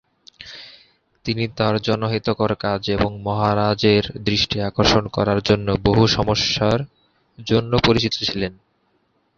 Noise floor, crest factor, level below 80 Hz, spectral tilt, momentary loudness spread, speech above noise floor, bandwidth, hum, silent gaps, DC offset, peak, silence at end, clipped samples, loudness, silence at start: -65 dBFS; 18 dB; -40 dBFS; -5.5 dB/octave; 13 LU; 46 dB; 7.4 kHz; none; none; under 0.1%; -2 dBFS; 0.85 s; under 0.1%; -19 LUFS; 0.4 s